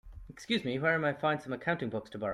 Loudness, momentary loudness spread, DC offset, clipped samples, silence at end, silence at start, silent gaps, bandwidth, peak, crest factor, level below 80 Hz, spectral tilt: -32 LUFS; 10 LU; under 0.1%; under 0.1%; 0 s; 0.05 s; none; 12.5 kHz; -14 dBFS; 18 dB; -58 dBFS; -6 dB/octave